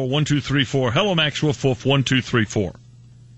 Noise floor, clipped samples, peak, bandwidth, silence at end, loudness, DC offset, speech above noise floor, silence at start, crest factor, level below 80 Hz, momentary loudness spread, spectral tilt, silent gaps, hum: -46 dBFS; under 0.1%; -6 dBFS; 8.4 kHz; 0.65 s; -20 LUFS; under 0.1%; 26 dB; 0 s; 16 dB; -48 dBFS; 4 LU; -5 dB/octave; none; none